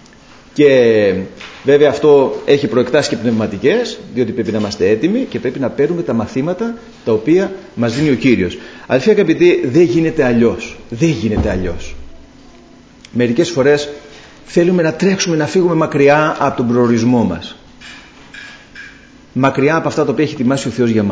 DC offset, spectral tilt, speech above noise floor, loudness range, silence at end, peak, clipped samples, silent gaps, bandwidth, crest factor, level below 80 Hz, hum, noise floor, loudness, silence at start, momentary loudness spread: under 0.1%; -6 dB/octave; 28 dB; 5 LU; 0 s; 0 dBFS; under 0.1%; none; 8 kHz; 14 dB; -38 dBFS; none; -41 dBFS; -14 LUFS; 0.55 s; 15 LU